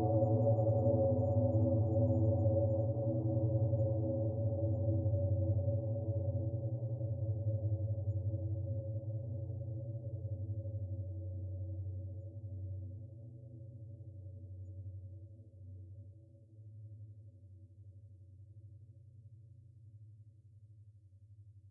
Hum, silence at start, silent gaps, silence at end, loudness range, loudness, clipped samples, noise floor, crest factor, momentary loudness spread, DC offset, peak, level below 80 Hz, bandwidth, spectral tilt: none; 0 s; none; 0 s; 24 LU; -36 LUFS; under 0.1%; -60 dBFS; 16 dB; 24 LU; under 0.1%; -20 dBFS; -74 dBFS; 1.3 kHz; -17 dB/octave